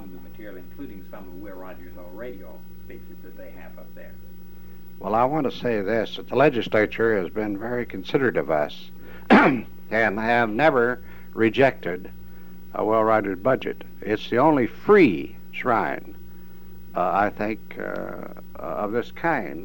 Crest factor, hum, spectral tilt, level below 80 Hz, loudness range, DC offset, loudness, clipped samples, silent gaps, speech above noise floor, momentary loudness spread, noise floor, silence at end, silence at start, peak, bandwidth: 20 dB; 60 Hz at -55 dBFS; -7 dB/octave; -52 dBFS; 20 LU; 1%; -22 LUFS; under 0.1%; none; 24 dB; 23 LU; -47 dBFS; 0 s; 0 s; -4 dBFS; 16.5 kHz